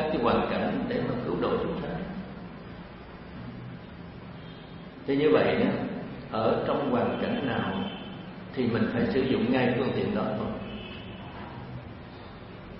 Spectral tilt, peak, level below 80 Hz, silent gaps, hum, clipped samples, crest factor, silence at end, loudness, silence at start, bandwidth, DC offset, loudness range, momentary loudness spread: -10.5 dB/octave; -10 dBFS; -52 dBFS; none; none; under 0.1%; 20 dB; 0 s; -28 LUFS; 0 s; 5.8 kHz; under 0.1%; 8 LU; 18 LU